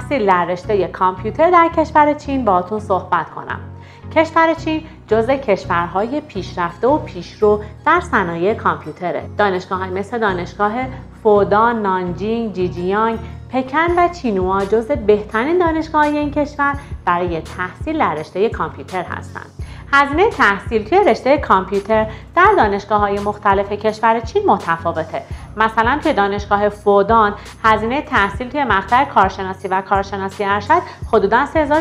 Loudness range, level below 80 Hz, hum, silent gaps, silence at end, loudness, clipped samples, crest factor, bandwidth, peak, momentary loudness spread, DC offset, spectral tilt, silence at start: 3 LU; -38 dBFS; none; none; 0 s; -16 LUFS; under 0.1%; 16 dB; 11.5 kHz; 0 dBFS; 10 LU; under 0.1%; -6.5 dB/octave; 0 s